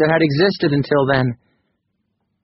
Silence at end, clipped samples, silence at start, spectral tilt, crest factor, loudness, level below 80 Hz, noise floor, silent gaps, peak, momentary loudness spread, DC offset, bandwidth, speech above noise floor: 1.1 s; under 0.1%; 0 s; -5 dB/octave; 16 dB; -17 LUFS; -50 dBFS; -71 dBFS; none; -2 dBFS; 7 LU; under 0.1%; 5.8 kHz; 55 dB